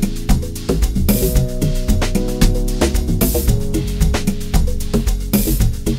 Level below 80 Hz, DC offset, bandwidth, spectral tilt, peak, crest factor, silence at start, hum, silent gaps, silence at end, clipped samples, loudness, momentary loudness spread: -18 dBFS; under 0.1%; 16.5 kHz; -5.5 dB/octave; 0 dBFS; 16 dB; 0 s; none; none; 0 s; under 0.1%; -18 LUFS; 4 LU